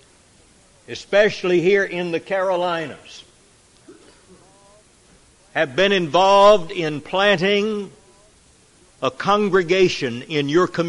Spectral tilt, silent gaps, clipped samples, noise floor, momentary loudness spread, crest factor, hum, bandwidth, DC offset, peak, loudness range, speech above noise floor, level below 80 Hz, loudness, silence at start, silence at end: -5 dB/octave; none; under 0.1%; -53 dBFS; 13 LU; 18 dB; none; 11.5 kHz; under 0.1%; -2 dBFS; 10 LU; 35 dB; -58 dBFS; -18 LUFS; 0.9 s; 0 s